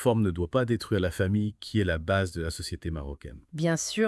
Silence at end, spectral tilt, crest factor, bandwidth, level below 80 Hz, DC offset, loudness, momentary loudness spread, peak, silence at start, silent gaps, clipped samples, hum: 0 s; -5.5 dB/octave; 18 dB; 12 kHz; -48 dBFS; under 0.1%; -29 LUFS; 9 LU; -10 dBFS; 0 s; none; under 0.1%; none